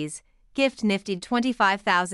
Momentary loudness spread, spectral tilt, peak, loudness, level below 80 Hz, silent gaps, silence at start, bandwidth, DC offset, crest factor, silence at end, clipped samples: 13 LU; -4 dB/octave; -8 dBFS; -24 LUFS; -60 dBFS; none; 0 s; 12 kHz; under 0.1%; 18 dB; 0 s; under 0.1%